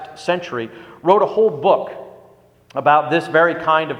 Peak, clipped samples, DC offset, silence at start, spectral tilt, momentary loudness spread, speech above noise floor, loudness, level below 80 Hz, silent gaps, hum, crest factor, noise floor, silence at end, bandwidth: 0 dBFS; under 0.1%; under 0.1%; 0 s; -6 dB/octave; 14 LU; 33 dB; -17 LUFS; -64 dBFS; none; 60 Hz at -55 dBFS; 18 dB; -50 dBFS; 0 s; 11 kHz